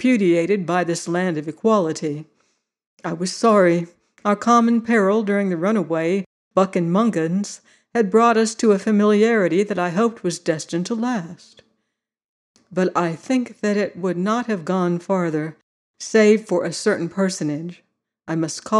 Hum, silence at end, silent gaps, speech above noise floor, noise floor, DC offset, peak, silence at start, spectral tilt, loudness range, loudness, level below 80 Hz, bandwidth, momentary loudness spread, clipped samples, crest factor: none; 0 s; 2.87-2.97 s, 6.26-6.51 s, 12.24-12.55 s, 15.63-15.94 s; 58 dB; -77 dBFS; under 0.1%; -4 dBFS; 0 s; -5.5 dB/octave; 6 LU; -20 LUFS; -72 dBFS; 11.5 kHz; 11 LU; under 0.1%; 16 dB